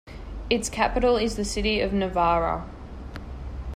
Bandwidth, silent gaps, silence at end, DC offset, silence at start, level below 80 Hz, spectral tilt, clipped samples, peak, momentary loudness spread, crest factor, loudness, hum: 15.5 kHz; none; 0 s; under 0.1%; 0.05 s; -36 dBFS; -4.5 dB/octave; under 0.1%; -8 dBFS; 17 LU; 16 dB; -24 LUFS; none